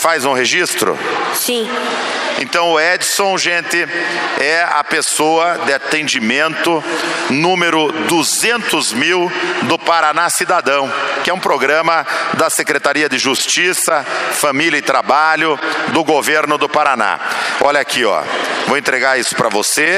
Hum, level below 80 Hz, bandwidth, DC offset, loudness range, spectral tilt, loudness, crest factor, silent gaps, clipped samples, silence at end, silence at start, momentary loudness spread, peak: none; -62 dBFS; 15.5 kHz; under 0.1%; 1 LU; -2 dB/octave; -14 LUFS; 14 dB; none; under 0.1%; 0 s; 0 s; 5 LU; 0 dBFS